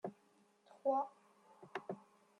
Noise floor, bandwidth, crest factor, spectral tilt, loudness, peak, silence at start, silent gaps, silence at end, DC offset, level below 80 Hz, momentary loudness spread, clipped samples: -72 dBFS; 10.5 kHz; 20 dB; -6.5 dB/octave; -43 LUFS; -26 dBFS; 0.05 s; none; 0.4 s; under 0.1%; under -90 dBFS; 14 LU; under 0.1%